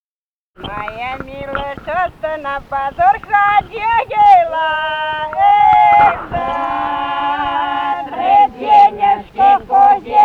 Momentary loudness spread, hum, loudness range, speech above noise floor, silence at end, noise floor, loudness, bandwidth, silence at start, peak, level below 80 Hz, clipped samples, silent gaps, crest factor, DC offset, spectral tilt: 14 LU; none; 5 LU; over 75 dB; 0 s; under -90 dBFS; -13 LUFS; 5.2 kHz; 0.6 s; -2 dBFS; -42 dBFS; under 0.1%; none; 12 dB; under 0.1%; -5.5 dB/octave